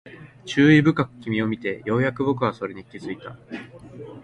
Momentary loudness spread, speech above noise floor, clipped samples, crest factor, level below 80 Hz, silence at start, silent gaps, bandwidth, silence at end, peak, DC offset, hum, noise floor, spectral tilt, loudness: 22 LU; 18 dB; under 0.1%; 20 dB; -56 dBFS; 0.05 s; none; 9 kHz; 0.05 s; -2 dBFS; under 0.1%; none; -40 dBFS; -7 dB/octave; -21 LUFS